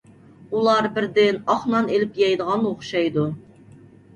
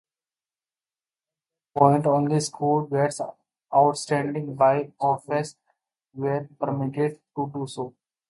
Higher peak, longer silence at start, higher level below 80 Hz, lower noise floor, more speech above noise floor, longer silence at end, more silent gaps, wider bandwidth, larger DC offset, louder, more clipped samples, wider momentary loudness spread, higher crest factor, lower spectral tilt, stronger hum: about the same, -6 dBFS vs -4 dBFS; second, 0.5 s vs 1.75 s; first, -62 dBFS vs -68 dBFS; second, -47 dBFS vs under -90 dBFS; second, 27 dB vs over 67 dB; first, 0.75 s vs 0.4 s; neither; second, 9.8 kHz vs 11.5 kHz; neither; first, -21 LUFS vs -24 LUFS; neither; second, 6 LU vs 13 LU; second, 16 dB vs 22 dB; about the same, -6 dB/octave vs -6.5 dB/octave; neither